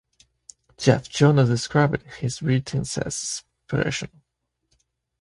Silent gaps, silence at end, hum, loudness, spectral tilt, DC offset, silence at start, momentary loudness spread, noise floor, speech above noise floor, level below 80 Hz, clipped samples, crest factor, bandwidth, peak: none; 1.15 s; none; -23 LUFS; -5.5 dB/octave; under 0.1%; 0.8 s; 12 LU; -77 dBFS; 55 dB; -52 dBFS; under 0.1%; 22 dB; 11.5 kHz; -2 dBFS